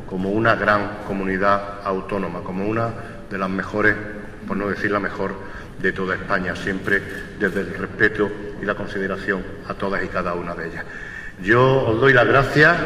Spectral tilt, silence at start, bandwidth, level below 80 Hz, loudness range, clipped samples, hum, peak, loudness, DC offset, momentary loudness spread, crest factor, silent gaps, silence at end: -6.5 dB/octave; 0 s; 15 kHz; -42 dBFS; 4 LU; under 0.1%; none; -2 dBFS; -21 LUFS; under 0.1%; 14 LU; 20 dB; none; 0 s